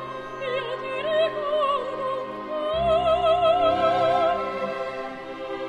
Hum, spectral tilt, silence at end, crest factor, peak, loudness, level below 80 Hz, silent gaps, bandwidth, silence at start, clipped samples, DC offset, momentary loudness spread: none; -5.5 dB/octave; 0 s; 14 dB; -10 dBFS; -24 LUFS; -50 dBFS; none; 9 kHz; 0 s; under 0.1%; under 0.1%; 12 LU